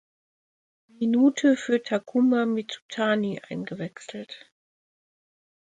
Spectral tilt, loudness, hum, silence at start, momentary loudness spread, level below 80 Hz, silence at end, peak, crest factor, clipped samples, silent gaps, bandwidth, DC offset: -5.5 dB/octave; -25 LUFS; none; 1 s; 18 LU; -74 dBFS; 1.3 s; -10 dBFS; 16 dB; under 0.1%; 2.82-2.89 s; 9.2 kHz; under 0.1%